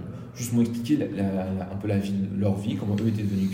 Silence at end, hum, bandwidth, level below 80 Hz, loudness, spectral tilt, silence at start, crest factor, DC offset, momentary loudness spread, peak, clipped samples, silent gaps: 0 s; none; 16 kHz; -58 dBFS; -27 LUFS; -7 dB/octave; 0 s; 14 dB; under 0.1%; 6 LU; -12 dBFS; under 0.1%; none